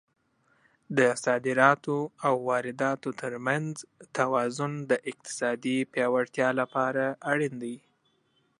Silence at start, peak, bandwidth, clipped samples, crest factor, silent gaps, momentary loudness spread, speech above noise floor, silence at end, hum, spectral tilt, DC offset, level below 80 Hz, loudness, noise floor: 0.9 s; -6 dBFS; 11.5 kHz; under 0.1%; 24 dB; none; 11 LU; 43 dB; 0.8 s; none; -5 dB/octave; under 0.1%; -78 dBFS; -28 LUFS; -70 dBFS